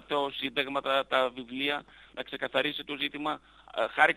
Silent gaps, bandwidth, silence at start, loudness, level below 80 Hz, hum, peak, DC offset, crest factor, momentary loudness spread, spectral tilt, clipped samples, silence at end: none; 13.5 kHz; 0.1 s; -31 LUFS; -66 dBFS; none; -8 dBFS; under 0.1%; 22 dB; 12 LU; -4 dB/octave; under 0.1%; 0 s